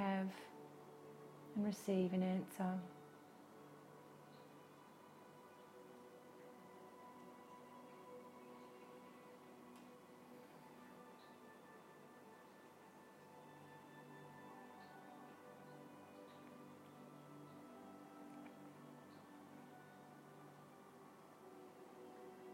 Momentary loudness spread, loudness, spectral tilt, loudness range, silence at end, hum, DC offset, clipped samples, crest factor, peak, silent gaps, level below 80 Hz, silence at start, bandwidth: 18 LU; -52 LUFS; -7 dB/octave; 17 LU; 0 s; none; under 0.1%; under 0.1%; 24 dB; -28 dBFS; none; under -90 dBFS; 0 s; 16 kHz